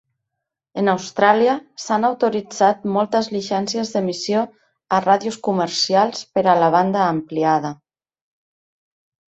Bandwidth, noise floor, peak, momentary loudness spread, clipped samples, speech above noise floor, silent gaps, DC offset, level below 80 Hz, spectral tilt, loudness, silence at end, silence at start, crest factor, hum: 8.2 kHz; -81 dBFS; -2 dBFS; 7 LU; under 0.1%; 63 dB; none; under 0.1%; -64 dBFS; -4.5 dB/octave; -19 LUFS; 1.55 s; 0.75 s; 18 dB; none